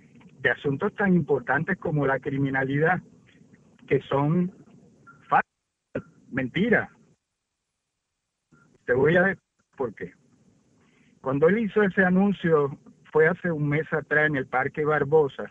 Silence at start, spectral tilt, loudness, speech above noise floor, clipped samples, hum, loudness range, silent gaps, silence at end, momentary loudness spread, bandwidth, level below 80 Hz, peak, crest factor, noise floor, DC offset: 0.4 s; -9 dB/octave; -24 LUFS; 58 dB; under 0.1%; none; 5 LU; none; 0 s; 14 LU; 7.2 kHz; -60 dBFS; -8 dBFS; 18 dB; -81 dBFS; under 0.1%